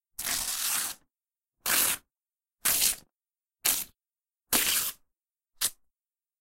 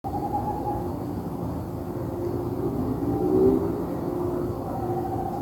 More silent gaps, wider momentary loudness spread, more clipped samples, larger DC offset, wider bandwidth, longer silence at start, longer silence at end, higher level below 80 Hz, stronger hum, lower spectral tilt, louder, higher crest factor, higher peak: neither; about the same, 11 LU vs 10 LU; neither; neither; about the same, 17 kHz vs 17 kHz; first, 0.2 s vs 0.05 s; first, 0.7 s vs 0 s; second, -60 dBFS vs -44 dBFS; neither; second, 1 dB/octave vs -9 dB/octave; about the same, -27 LUFS vs -27 LUFS; first, 28 dB vs 18 dB; first, -4 dBFS vs -10 dBFS